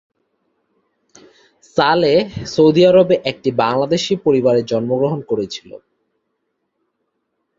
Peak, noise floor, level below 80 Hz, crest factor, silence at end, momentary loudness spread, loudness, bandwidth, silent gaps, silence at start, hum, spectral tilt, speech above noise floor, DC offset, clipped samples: -2 dBFS; -72 dBFS; -54 dBFS; 16 dB; 1.85 s; 11 LU; -15 LUFS; 7.6 kHz; none; 1.75 s; none; -6 dB/octave; 57 dB; under 0.1%; under 0.1%